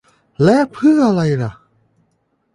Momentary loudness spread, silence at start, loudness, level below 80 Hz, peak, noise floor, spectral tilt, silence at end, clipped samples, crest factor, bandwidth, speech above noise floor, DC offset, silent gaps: 8 LU; 0.4 s; -15 LUFS; -52 dBFS; -2 dBFS; -65 dBFS; -7.5 dB/octave; 1 s; under 0.1%; 14 dB; 11 kHz; 51 dB; under 0.1%; none